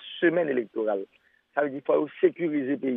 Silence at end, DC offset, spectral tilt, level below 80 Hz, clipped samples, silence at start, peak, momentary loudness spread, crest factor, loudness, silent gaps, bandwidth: 0 s; under 0.1%; -9.5 dB/octave; -84 dBFS; under 0.1%; 0 s; -8 dBFS; 8 LU; 18 dB; -27 LUFS; none; 3.8 kHz